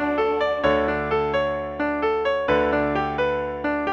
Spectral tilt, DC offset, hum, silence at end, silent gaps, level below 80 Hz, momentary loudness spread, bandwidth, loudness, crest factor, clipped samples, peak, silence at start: -7 dB/octave; under 0.1%; none; 0 s; none; -42 dBFS; 5 LU; 7.2 kHz; -23 LUFS; 16 dB; under 0.1%; -6 dBFS; 0 s